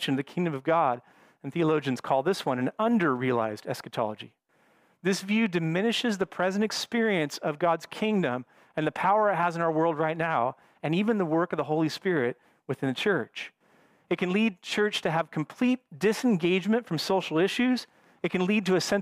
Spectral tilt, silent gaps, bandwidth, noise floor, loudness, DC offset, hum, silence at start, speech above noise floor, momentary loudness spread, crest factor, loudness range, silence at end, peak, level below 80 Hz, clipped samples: -5.5 dB/octave; none; 15.5 kHz; -65 dBFS; -27 LUFS; under 0.1%; none; 0 s; 38 dB; 8 LU; 16 dB; 3 LU; 0 s; -12 dBFS; -72 dBFS; under 0.1%